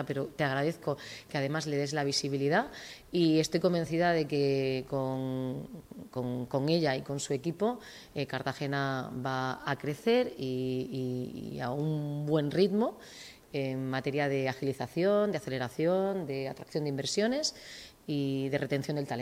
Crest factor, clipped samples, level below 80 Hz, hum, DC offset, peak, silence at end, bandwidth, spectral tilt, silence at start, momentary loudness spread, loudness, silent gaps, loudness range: 18 dB; under 0.1%; -66 dBFS; none; under 0.1%; -14 dBFS; 0 s; 16 kHz; -5.5 dB/octave; 0 s; 10 LU; -32 LUFS; none; 4 LU